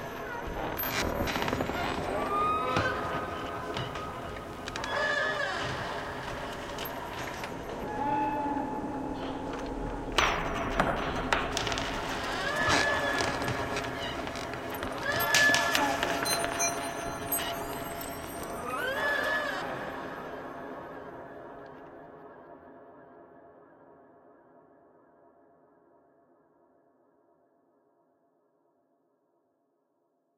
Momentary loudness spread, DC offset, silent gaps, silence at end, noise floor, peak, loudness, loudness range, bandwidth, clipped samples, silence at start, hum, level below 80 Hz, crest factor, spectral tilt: 14 LU; under 0.1%; none; 5.8 s; -75 dBFS; -10 dBFS; -31 LUFS; 13 LU; 16.5 kHz; under 0.1%; 0 s; none; -50 dBFS; 24 dB; -3 dB/octave